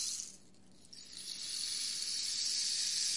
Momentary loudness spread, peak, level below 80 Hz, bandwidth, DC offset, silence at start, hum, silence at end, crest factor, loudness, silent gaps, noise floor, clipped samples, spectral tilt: 16 LU; -20 dBFS; -76 dBFS; 11.5 kHz; 0.1%; 0 s; none; 0 s; 20 dB; -35 LUFS; none; -63 dBFS; under 0.1%; 2.5 dB/octave